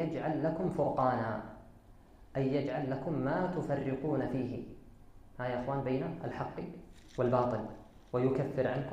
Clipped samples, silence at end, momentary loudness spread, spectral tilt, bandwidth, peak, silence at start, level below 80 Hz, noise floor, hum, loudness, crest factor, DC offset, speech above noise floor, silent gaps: under 0.1%; 0 s; 14 LU; -9 dB/octave; 9.6 kHz; -16 dBFS; 0 s; -58 dBFS; -57 dBFS; none; -34 LUFS; 18 dB; under 0.1%; 24 dB; none